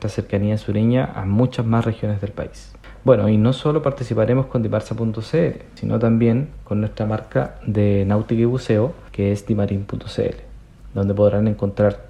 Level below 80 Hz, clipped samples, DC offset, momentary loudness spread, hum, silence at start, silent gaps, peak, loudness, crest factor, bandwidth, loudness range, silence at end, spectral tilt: -42 dBFS; under 0.1%; under 0.1%; 8 LU; none; 0 s; none; 0 dBFS; -20 LUFS; 18 dB; 9.8 kHz; 2 LU; 0 s; -8.5 dB/octave